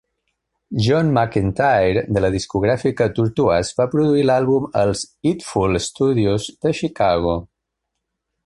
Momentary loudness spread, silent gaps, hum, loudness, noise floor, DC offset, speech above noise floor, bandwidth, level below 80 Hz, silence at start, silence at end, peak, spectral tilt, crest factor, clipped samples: 6 LU; none; none; -19 LUFS; -78 dBFS; under 0.1%; 60 dB; 11.5 kHz; -40 dBFS; 0.7 s; 1 s; -2 dBFS; -6 dB/octave; 16 dB; under 0.1%